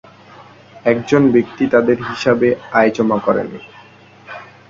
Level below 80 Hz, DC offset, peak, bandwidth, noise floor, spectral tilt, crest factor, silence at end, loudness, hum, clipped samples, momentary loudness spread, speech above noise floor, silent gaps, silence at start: -54 dBFS; under 0.1%; 0 dBFS; 7.6 kHz; -43 dBFS; -7 dB/octave; 16 dB; 0.25 s; -15 LUFS; none; under 0.1%; 19 LU; 28 dB; none; 0.4 s